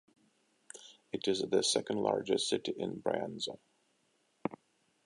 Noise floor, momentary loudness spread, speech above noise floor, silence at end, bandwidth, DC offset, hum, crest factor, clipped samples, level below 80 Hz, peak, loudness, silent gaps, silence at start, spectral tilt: -75 dBFS; 21 LU; 41 dB; 0.5 s; 11.5 kHz; under 0.1%; none; 22 dB; under 0.1%; -76 dBFS; -14 dBFS; -34 LUFS; none; 0.75 s; -3.5 dB/octave